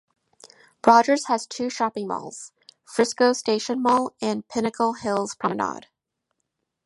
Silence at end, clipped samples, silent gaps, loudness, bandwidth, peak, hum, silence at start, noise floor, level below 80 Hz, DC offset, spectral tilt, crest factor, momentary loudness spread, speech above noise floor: 1.05 s; under 0.1%; none; -23 LUFS; 11.5 kHz; 0 dBFS; none; 0.85 s; -79 dBFS; -68 dBFS; under 0.1%; -4 dB/octave; 24 dB; 13 LU; 57 dB